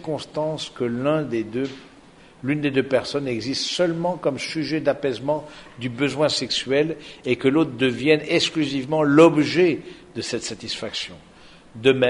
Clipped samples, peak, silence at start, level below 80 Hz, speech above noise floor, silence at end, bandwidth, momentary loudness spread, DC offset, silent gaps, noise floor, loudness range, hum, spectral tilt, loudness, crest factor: under 0.1%; -2 dBFS; 0 s; -58 dBFS; 27 dB; 0 s; 11 kHz; 11 LU; under 0.1%; none; -49 dBFS; 5 LU; none; -5 dB/octave; -22 LUFS; 20 dB